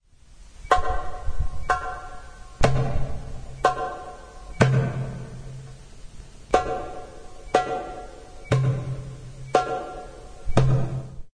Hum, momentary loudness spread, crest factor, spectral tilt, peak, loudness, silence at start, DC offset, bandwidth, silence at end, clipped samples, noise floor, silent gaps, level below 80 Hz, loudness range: none; 21 LU; 22 dB; -6.5 dB/octave; -2 dBFS; -26 LUFS; 0.3 s; under 0.1%; 10.5 kHz; 0.05 s; under 0.1%; -48 dBFS; none; -36 dBFS; 2 LU